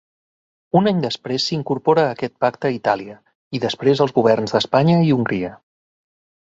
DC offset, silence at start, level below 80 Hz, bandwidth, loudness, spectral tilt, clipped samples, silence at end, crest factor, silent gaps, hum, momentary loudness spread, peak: under 0.1%; 0.75 s; -58 dBFS; 7.8 kHz; -19 LUFS; -6.5 dB/octave; under 0.1%; 0.9 s; 18 dB; 3.35-3.51 s; none; 9 LU; -2 dBFS